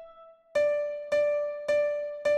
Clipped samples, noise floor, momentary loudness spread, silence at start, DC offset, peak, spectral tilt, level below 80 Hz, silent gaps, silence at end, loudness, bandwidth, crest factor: under 0.1%; -53 dBFS; 4 LU; 0 s; under 0.1%; -16 dBFS; -3 dB/octave; -70 dBFS; none; 0 s; -28 LUFS; 9.6 kHz; 12 dB